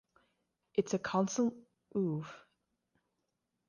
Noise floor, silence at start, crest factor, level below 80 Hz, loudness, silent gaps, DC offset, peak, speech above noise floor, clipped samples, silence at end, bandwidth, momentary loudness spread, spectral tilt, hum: -84 dBFS; 0.75 s; 20 dB; -76 dBFS; -35 LUFS; none; under 0.1%; -18 dBFS; 51 dB; under 0.1%; 1.3 s; 10 kHz; 8 LU; -5.5 dB/octave; none